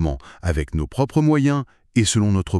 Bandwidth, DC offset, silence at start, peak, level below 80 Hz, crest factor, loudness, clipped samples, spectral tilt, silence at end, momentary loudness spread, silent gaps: 12.5 kHz; under 0.1%; 0 s; -4 dBFS; -32 dBFS; 16 dB; -21 LUFS; under 0.1%; -5.5 dB/octave; 0 s; 8 LU; none